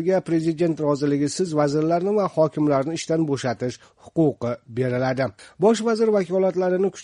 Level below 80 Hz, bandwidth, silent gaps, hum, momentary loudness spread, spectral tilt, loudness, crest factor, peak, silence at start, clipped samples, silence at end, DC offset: -62 dBFS; 10.5 kHz; none; none; 7 LU; -6.5 dB/octave; -22 LUFS; 16 dB; -6 dBFS; 0 s; under 0.1%; 0 s; under 0.1%